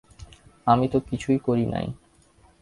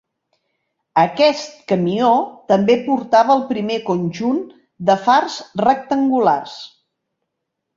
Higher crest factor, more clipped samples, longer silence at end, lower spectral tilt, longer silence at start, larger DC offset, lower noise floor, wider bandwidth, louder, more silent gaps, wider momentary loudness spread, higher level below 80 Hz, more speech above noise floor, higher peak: about the same, 20 dB vs 16 dB; neither; second, 0.65 s vs 1.1 s; first, -8 dB/octave vs -6 dB/octave; second, 0.2 s vs 0.95 s; neither; second, -57 dBFS vs -78 dBFS; first, 11.5 kHz vs 7.6 kHz; second, -24 LUFS vs -17 LUFS; neither; first, 12 LU vs 8 LU; first, -50 dBFS vs -62 dBFS; second, 35 dB vs 61 dB; about the same, -4 dBFS vs -2 dBFS